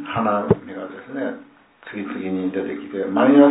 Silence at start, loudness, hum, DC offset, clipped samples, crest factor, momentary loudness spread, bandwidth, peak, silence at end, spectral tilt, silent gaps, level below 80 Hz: 0 s; -22 LUFS; none; under 0.1%; under 0.1%; 20 dB; 17 LU; 4 kHz; 0 dBFS; 0 s; -11.5 dB/octave; none; -54 dBFS